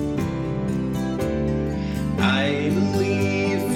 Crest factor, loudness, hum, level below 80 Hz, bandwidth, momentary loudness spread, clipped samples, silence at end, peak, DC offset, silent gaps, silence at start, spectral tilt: 16 dB; -23 LUFS; none; -38 dBFS; 16 kHz; 5 LU; under 0.1%; 0 s; -6 dBFS; under 0.1%; none; 0 s; -6.5 dB/octave